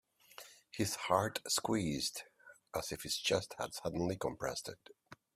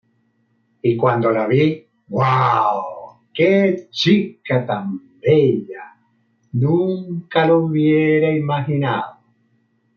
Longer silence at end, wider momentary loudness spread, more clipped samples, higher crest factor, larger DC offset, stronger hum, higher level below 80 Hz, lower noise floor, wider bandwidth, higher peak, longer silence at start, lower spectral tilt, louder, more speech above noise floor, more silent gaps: second, 0.2 s vs 0.85 s; first, 20 LU vs 12 LU; neither; first, 24 dB vs 16 dB; neither; neither; about the same, -66 dBFS vs -62 dBFS; second, -58 dBFS vs -63 dBFS; first, 16 kHz vs 7 kHz; second, -16 dBFS vs -2 dBFS; second, 0.4 s vs 0.85 s; second, -3.5 dB/octave vs -8 dB/octave; second, -37 LUFS vs -18 LUFS; second, 20 dB vs 47 dB; neither